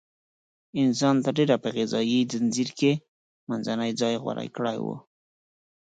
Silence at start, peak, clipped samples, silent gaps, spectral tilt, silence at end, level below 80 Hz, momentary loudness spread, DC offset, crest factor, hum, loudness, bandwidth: 0.75 s; -8 dBFS; under 0.1%; 3.08-3.47 s; -5.5 dB/octave; 0.85 s; -72 dBFS; 10 LU; under 0.1%; 18 dB; none; -26 LUFS; 9.2 kHz